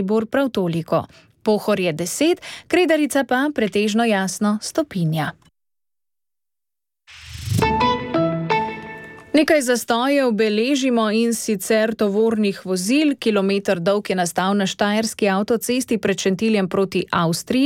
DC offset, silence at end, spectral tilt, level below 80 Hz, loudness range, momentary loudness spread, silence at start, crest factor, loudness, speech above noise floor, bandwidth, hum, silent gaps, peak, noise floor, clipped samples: under 0.1%; 0 s; -5 dB/octave; -50 dBFS; 6 LU; 6 LU; 0 s; 16 dB; -20 LUFS; over 71 dB; 17 kHz; none; none; -4 dBFS; under -90 dBFS; under 0.1%